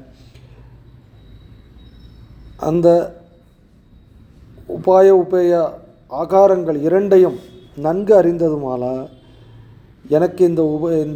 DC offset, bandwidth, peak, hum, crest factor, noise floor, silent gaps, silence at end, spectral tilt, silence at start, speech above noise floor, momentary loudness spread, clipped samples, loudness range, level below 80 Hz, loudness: under 0.1%; 8.8 kHz; 0 dBFS; none; 16 dB; -49 dBFS; none; 0 s; -8.5 dB/octave; 2.45 s; 35 dB; 16 LU; under 0.1%; 7 LU; -48 dBFS; -15 LUFS